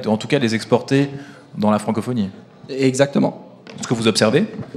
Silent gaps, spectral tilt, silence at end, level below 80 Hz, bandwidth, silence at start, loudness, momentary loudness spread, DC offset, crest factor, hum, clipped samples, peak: none; -5.5 dB/octave; 0 s; -62 dBFS; 13.5 kHz; 0 s; -19 LUFS; 15 LU; under 0.1%; 18 dB; none; under 0.1%; 0 dBFS